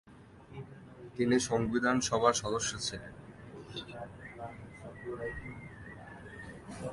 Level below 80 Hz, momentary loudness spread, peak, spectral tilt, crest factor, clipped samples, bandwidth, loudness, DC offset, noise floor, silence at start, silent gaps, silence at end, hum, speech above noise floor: -58 dBFS; 21 LU; -12 dBFS; -4 dB/octave; 24 dB; under 0.1%; 11.5 kHz; -32 LUFS; under 0.1%; -55 dBFS; 0.05 s; none; 0 s; none; 24 dB